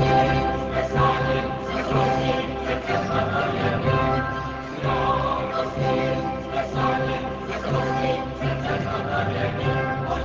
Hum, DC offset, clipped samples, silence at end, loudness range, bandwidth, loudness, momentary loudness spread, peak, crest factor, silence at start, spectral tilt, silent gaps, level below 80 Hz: none; under 0.1%; under 0.1%; 0 s; 2 LU; 7.6 kHz; -24 LUFS; 6 LU; -8 dBFS; 16 dB; 0 s; -7 dB/octave; none; -38 dBFS